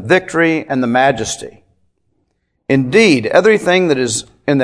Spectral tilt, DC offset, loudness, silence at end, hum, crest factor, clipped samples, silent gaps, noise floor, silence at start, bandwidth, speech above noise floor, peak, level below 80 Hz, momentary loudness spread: -4.5 dB/octave; under 0.1%; -13 LUFS; 0 s; none; 14 dB; under 0.1%; none; -66 dBFS; 0 s; 11 kHz; 53 dB; 0 dBFS; -50 dBFS; 11 LU